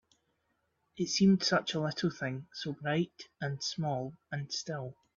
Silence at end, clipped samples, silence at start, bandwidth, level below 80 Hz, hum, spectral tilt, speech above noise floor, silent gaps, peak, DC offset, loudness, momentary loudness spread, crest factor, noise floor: 0.25 s; under 0.1%; 0.95 s; 7.4 kHz; -70 dBFS; none; -5 dB/octave; 46 dB; none; -16 dBFS; under 0.1%; -33 LUFS; 14 LU; 18 dB; -78 dBFS